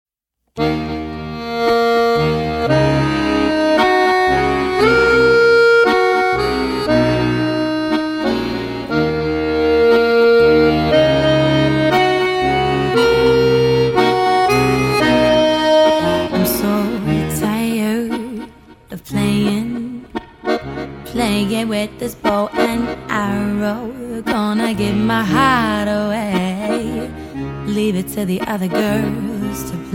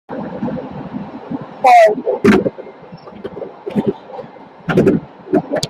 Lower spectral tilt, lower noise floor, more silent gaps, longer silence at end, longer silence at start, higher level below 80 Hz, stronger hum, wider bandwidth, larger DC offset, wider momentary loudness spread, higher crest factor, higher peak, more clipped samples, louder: about the same, -5.5 dB/octave vs -6.5 dB/octave; first, -72 dBFS vs -36 dBFS; neither; about the same, 0 s vs 0 s; first, 0.55 s vs 0.1 s; first, -38 dBFS vs -48 dBFS; neither; about the same, 17 kHz vs 15.5 kHz; neither; second, 12 LU vs 23 LU; about the same, 14 dB vs 16 dB; about the same, 0 dBFS vs 0 dBFS; neither; about the same, -15 LUFS vs -15 LUFS